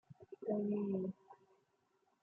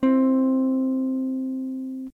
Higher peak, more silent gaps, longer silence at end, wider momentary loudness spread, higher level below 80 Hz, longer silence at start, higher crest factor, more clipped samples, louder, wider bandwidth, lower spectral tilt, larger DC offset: second, -26 dBFS vs -12 dBFS; neither; first, 0.9 s vs 0.1 s; first, 19 LU vs 12 LU; second, -86 dBFS vs -66 dBFS; about the same, 0.1 s vs 0 s; first, 16 dB vs 10 dB; neither; second, -41 LUFS vs -24 LUFS; about the same, 3 kHz vs 3.1 kHz; first, -11.5 dB/octave vs -8 dB/octave; neither